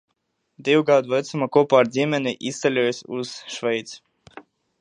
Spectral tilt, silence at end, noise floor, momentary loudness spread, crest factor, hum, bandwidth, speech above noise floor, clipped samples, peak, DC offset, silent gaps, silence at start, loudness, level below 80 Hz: -5 dB/octave; 0.4 s; -74 dBFS; 13 LU; 20 dB; none; 10 kHz; 53 dB; under 0.1%; -4 dBFS; under 0.1%; none; 0.6 s; -21 LUFS; -72 dBFS